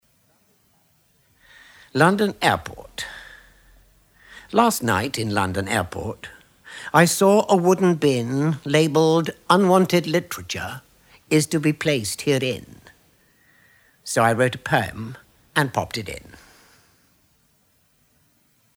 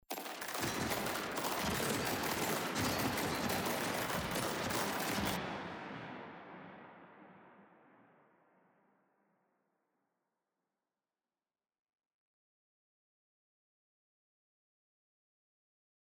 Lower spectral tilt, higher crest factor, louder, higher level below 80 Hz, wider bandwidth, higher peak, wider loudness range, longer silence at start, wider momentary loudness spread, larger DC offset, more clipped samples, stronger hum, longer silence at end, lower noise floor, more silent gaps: first, -5 dB/octave vs -3.5 dB/octave; about the same, 22 dB vs 20 dB; first, -20 LUFS vs -37 LUFS; first, -56 dBFS vs -64 dBFS; about the same, over 20 kHz vs over 20 kHz; first, 0 dBFS vs -22 dBFS; second, 6 LU vs 17 LU; first, 1.95 s vs 0.1 s; about the same, 17 LU vs 16 LU; neither; neither; neither; second, 2.55 s vs 8.4 s; second, -63 dBFS vs under -90 dBFS; neither